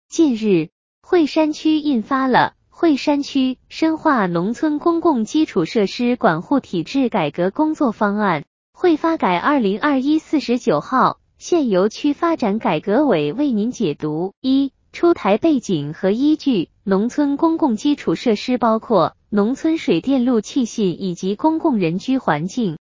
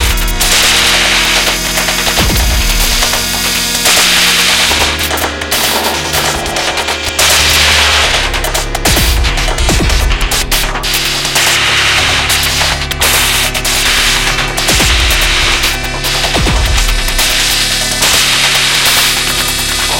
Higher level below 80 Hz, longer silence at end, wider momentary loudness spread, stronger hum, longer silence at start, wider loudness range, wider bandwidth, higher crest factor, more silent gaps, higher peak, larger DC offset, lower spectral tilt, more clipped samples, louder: second, -56 dBFS vs -18 dBFS; about the same, 0.1 s vs 0 s; about the same, 4 LU vs 6 LU; neither; about the same, 0.1 s vs 0 s; about the same, 1 LU vs 2 LU; second, 7.6 kHz vs 17.5 kHz; first, 16 dB vs 10 dB; first, 0.72-1.01 s, 8.47-8.73 s, 14.37-14.42 s vs none; about the same, -2 dBFS vs 0 dBFS; second, under 0.1% vs 0.5%; first, -6 dB/octave vs -1.5 dB/octave; second, under 0.1% vs 0.1%; second, -18 LUFS vs -9 LUFS